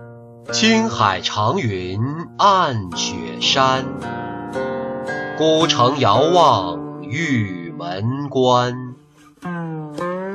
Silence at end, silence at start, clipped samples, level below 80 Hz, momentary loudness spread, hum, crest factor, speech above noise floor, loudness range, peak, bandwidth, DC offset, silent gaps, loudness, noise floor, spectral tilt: 0 s; 0 s; under 0.1%; -56 dBFS; 13 LU; none; 16 dB; 30 dB; 4 LU; -2 dBFS; 10.5 kHz; under 0.1%; none; -18 LUFS; -47 dBFS; -4.5 dB/octave